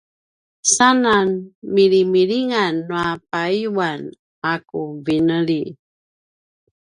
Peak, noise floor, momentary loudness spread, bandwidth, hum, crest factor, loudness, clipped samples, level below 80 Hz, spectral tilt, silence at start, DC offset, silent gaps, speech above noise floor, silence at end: 0 dBFS; under -90 dBFS; 12 LU; 11 kHz; none; 18 dB; -18 LUFS; under 0.1%; -58 dBFS; -3.5 dB/octave; 0.65 s; under 0.1%; 1.55-1.62 s, 4.19-4.42 s; over 72 dB; 1.2 s